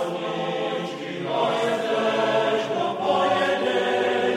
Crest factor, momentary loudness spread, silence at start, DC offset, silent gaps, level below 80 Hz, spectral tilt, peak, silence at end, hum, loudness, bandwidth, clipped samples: 14 dB; 6 LU; 0 s; under 0.1%; none; -70 dBFS; -4.5 dB/octave; -8 dBFS; 0 s; none; -23 LUFS; 14.5 kHz; under 0.1%